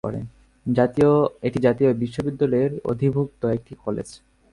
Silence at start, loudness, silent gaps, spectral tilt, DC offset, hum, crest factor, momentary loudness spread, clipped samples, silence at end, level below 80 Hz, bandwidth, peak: 0.05 s; -22 LUFS; none; -8.5 dB/octave; under 0.1%; none; 16 dB; 13 LU; under 0.1%; 0.35 s; -52 dBFS; 11 kHz; -6 dBFS